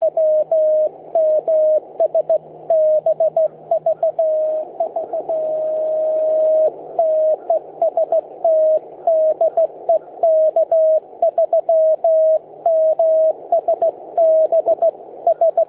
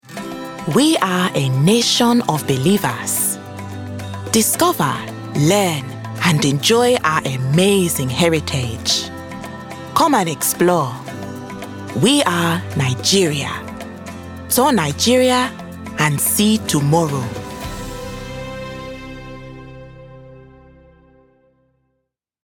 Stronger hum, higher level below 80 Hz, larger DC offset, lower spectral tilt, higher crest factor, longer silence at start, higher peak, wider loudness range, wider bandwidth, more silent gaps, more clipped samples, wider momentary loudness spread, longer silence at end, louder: neither; second, -72 dBFS vs -46 dBFS; neither; first, -9 dB/octave vs -4 dB/octave; second, 10 dB vs 18 dB; about the same, 0 s vs 0.05 s; second, -6 dBFS vs 0 dBFS; second, 3 LU vs 9 LU; second, 1.7 kHz vs 19 kHz; neither; neither; second, 6 LU vs 17 LU; second, 0.05 s vs 2 s; about the same, -17 LUFS vs -16 LUFS